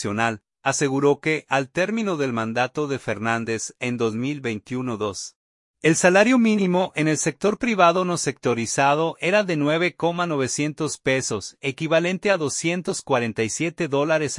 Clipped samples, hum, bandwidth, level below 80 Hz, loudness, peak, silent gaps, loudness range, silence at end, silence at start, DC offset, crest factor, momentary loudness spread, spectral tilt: under 0.1%; none; 11.5 kHz; -62 dBFS; -22 LUFS; -2 dBFS; 5.36-5.74 s; 5 LU; 0 s; 0 s; under 0.1%; 20 dB; 9 LU; -4.5 dB/octave